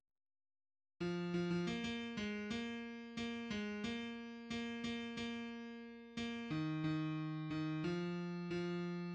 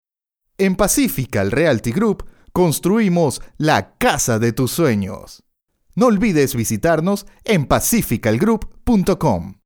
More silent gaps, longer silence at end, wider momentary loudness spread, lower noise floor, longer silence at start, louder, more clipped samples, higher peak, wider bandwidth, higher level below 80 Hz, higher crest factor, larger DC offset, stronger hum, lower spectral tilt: neither; about the same, 0 s vs 0.1 s; about the same, 8 LU vs 6 LU; first, under -90 dBFS vs -76 dBFS; first, 1 s vs 0.6 s; second, -43 LUFS vs -17 LUFS; neither; second, -28 dBFS vs 0 dBFS; second, 8.6 kHz vs over 20 kHz; second, -70 dBFS vs -38 dBFS; about the same, 14 dB vs 16 dB; neither; neither; about the same, -6 dB/octave vs -5 dB/octave